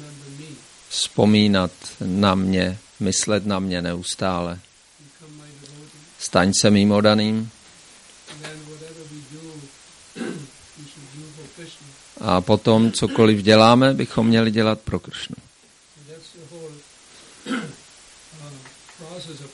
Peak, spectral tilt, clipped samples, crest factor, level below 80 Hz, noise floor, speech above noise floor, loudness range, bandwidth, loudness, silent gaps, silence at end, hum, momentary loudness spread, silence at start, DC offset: 0 dBFS; -5 dB/octave; under 0.1%; 22 dB; -54 dBFS; -53 dBFS; 35 dB; 20 LU; 11.5 kHz; -19 LUFS; none; 0.05 s; none; 25 LU; 0 s; under 0.1%